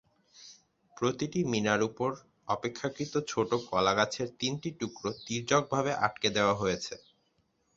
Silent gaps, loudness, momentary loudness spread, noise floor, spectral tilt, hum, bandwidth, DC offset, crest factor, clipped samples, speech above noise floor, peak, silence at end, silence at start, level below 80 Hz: none; -31 LUFS; 9 LU; -74 dBFS; -4.5 dB/octave; none; 8 kHz; under 0.1%; 22 dB; under 0.1%; 43 dB; -10 dBFS; 0.8 s; 0.4 s; -64 dBFS